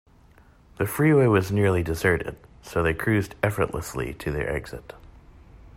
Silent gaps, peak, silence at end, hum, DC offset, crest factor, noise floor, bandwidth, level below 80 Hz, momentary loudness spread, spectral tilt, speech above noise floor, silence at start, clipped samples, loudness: none; -8 dBFS; 0 s; none; under 0.1%; 18 dB; -54 dBFS; 16 kHz; -44 dBFS; 13 LU; -6.5 dB/octave; 30 dB; 0.8 s; under 0.1%; -24 LUFS